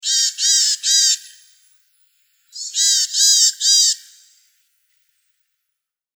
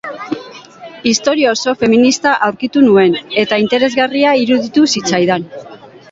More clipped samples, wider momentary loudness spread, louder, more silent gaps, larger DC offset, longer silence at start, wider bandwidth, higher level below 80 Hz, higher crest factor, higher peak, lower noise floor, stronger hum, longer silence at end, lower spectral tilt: neither; second, 11 LU vs 14 LU; about the same, -13 LUFS vs -12 LUFS; neither; neither; about the same, 0.05 s vs 0.05 s; first, over 20 kHz vs 8 kHz; second, under -90 dBFS vs -54 dBFS; about the same, 18 dB vs 14 dB; about the same, -2 dBFS vs 0 dBFS; first, -80 dBFS vs -34 dBFS; neither; first, 2.2 s vs 0.35 s; second, 15.5 dB/octave vs -4 dB/octave